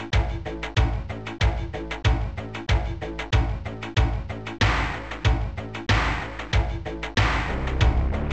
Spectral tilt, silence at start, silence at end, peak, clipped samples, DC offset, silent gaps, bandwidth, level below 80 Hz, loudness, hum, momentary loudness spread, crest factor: -5.5 dB/octave; 0 s; 0 s; -8 dBFS; under 0.1%; 0.4%; none; 8.4 kHz; -28 dBFS; -26 LUFS; none; 9 LU; 16 dB